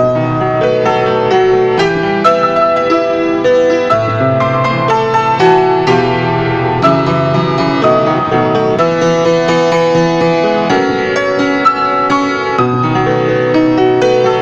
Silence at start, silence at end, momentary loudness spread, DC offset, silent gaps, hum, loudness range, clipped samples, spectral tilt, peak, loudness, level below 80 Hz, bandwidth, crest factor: 0 s; 0 s; 3 LU; under 0.1%; none; none; 1 LU; under 0.1%; -6.5 dB/octave; 0 dBFS; -11 LUFS; -42 dBFS; 8 kHz; 10 dB